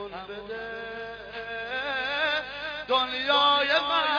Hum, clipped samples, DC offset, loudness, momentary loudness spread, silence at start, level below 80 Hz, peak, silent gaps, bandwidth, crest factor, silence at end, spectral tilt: 50 Hz at -55 dBFS; under 0.1%; under 0.1%; -26 LUFS; 17 LU; 0 s; -60 dBFS; -10 dBFS; none; 5.2 kHz; 18 dB; 0 s; -3 dB/octave